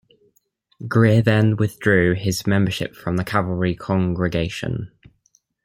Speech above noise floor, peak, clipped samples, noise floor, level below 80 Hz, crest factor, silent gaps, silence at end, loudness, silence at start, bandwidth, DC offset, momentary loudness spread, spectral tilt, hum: 46 dB; -2 dBFS; under 0.1%; -65 dBFS; -48 dBFS; 18 dB; none; 0.75 s; -20 LUFS; 0.8 s; 16 kHz; under 0.1%; 11 LU; -6.5 dB/octave; none